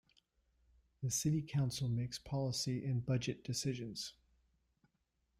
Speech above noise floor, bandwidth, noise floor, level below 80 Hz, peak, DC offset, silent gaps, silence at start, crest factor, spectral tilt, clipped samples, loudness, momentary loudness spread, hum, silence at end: 44 dB; 15.5 kHz; -82 dBFS; -66 dBFS; -24 dBFS; under 0.1%; none; 1 s; 16 dB; -5 dB/octave; under 0.1%; -39 LUFS; 8 LU; none; 1.3 s